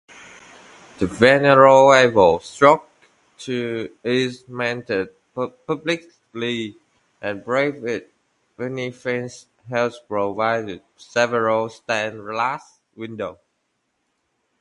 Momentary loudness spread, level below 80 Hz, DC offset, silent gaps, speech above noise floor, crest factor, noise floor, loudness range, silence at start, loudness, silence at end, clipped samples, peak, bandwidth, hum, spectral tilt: 19 LU; -56 dBFS; under 0.1%; none; 53 dB; 20 dB; -72 dBFS; 11 LU; 1 s; -19 LUFS; 1.25 s; under 0.1%; 0 dBFS; 11 kHz; none; -5 dB/octave